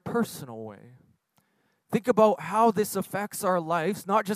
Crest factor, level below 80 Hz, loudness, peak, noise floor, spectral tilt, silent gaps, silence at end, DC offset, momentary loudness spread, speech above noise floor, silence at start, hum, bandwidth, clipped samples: 20 dB; -72 dBFS; -26 LUFS; -8 dBFS; -71 dBFS; -5.5 dB/octave; none; 0 s; under 0.1%; 17 LU; 46 dB; 0.05 s; none; 16 kHz; under 0.1%